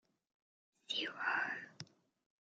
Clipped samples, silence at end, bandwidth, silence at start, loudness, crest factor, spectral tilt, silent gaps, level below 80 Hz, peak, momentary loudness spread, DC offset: under 0.1%; 0.6 s; 8.8 kHz; 0.9 s; -39 LUFS; 22 dB; -2 dB/octave; none; under -90 dBFS; -22 dBFS; 18 LU; under 0.1%